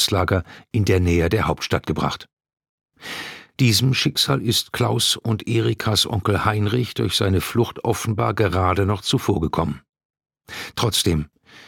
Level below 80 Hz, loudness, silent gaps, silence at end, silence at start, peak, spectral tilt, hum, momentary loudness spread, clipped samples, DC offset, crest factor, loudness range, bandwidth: -40 dBFS; -20 LUFS; 2.33-2.37 s, 2.69-2.78 s, 9.89-9.93 s, 10.05-10.10 s; 0.05 s; 0 s; -2 dBFS; -4.5 dB/octave; none; 13 LU; under 0.1%; under 0.1%; 20 dB; 3 LU; 18.5 kHz